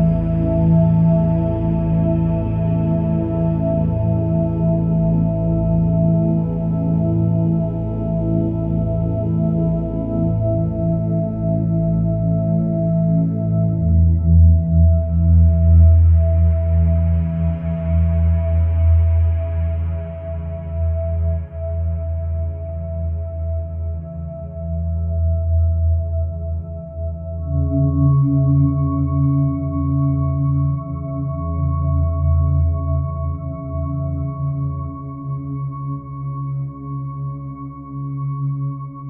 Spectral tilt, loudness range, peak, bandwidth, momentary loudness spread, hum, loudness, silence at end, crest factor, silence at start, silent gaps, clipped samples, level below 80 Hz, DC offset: -14 dB/octave; 10 LU; -2 dBFS; 2.6 kHz; 12 LU; none; -19 LUFS; 0 s; 14 dB; 0 s; none; under 0.1%; -28 dBFS; under 0.1%